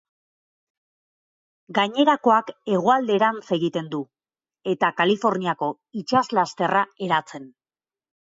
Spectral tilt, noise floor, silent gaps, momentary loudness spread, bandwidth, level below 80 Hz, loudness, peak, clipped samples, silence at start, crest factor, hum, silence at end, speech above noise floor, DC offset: -5.5 dB/octave; under -90 dBFS; none; 13 LU; 7.8 kHz; -72 dBFS; -22 LUFS; -6 dBFS; under 0.1%; 1.7 s; 18 dB; none; 0.8 s; over 68 dB; under 0.1%